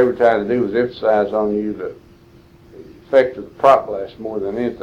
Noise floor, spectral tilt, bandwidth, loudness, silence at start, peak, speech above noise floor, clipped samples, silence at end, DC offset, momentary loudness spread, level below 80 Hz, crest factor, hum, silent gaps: -47 dBFS; -7 dB/octave; 8.8 kHz; -18 LUFS; 0 s; 0 dBFS; 30 dB; under 0.1%; 0 s; under 0.1%; 13 LU; -52 dBFS; 18 dB; none; none